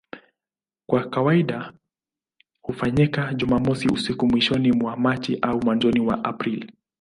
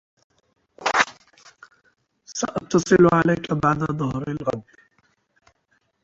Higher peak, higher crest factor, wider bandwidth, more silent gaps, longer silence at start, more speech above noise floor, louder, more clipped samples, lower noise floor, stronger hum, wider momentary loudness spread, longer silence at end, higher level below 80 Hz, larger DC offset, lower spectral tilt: second, -6 dBFS vs -2 dBFS; about the same, 18 dB vs 22 dB; first, 11 kHz vs 8 kHz; neither; second, 0.15 s vs 0.8 s; first, over 69 dB vs 48 dB; about the same, -22 LUFS vs -21 LUFS; neither; first, under -90 dBFS vs -68 dBFS; neither; about the same, 11 LU vs 13 LU; second, 0.3 s vs 1.4 s; about the same, -50 dBFS vs -54 dBFS; neither; first, -7 dB/octave vs -5.5 dB/octave